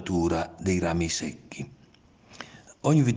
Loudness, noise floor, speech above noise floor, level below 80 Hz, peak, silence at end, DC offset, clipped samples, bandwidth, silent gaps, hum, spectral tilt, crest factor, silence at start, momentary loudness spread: -27 LUFS; -57 dBFS; 32 dB; -54 dBFS; -10 dBFS; 0 s; under 0.1%; under 0.1%; 10 kHz; none; none; -5.5 dB/octave; 18 dB; 0 s; 20 LU